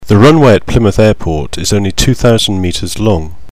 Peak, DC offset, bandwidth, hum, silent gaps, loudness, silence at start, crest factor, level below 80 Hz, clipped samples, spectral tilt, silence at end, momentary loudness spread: 0 dBFS; 9%; 16 kHz; none; none; -10 LUFS; 0 s; 10 dB; -24 dBFS; 1%; -5.5 dB/octave; 0.2 s; 10 LU